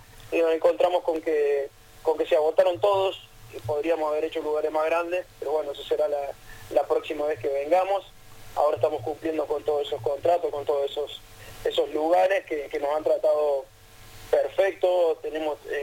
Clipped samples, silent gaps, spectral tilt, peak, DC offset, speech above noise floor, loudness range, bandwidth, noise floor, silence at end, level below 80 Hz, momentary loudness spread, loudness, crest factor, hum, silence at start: under 0.1%; none; -5 dB/octave; -8 dBFS; under 0.1%; 22 dB; 3 LU; 17 kHz; -47 dBFS; 0 s; -56 dBFS; 9 LU; -25 LUFS; 18 dB; none; 0 s